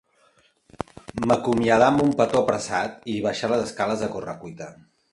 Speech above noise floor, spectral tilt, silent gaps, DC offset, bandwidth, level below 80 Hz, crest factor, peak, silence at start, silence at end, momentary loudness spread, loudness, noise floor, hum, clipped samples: 39 dB; -5.5 dB/octave; none; under 0.1%; 11.5 kHz; -54 dBFS; 20 dB; -4 dBFS; 0.8 s; 0.4 s; 19 LU; -23 LUFS; -61 dBFS; none; under 0.1%